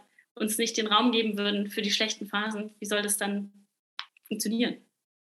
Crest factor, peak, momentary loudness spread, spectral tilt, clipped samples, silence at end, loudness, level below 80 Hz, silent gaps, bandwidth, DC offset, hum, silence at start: 22 dB; -8 dBFS; 19 LU; -2.5 dB/octave; under 0.1%; 0.45 s; -28 LUFS; -90 dBFS; 3.79-3.97 s; 14 kHz; under 0.1%; none; 0.35 s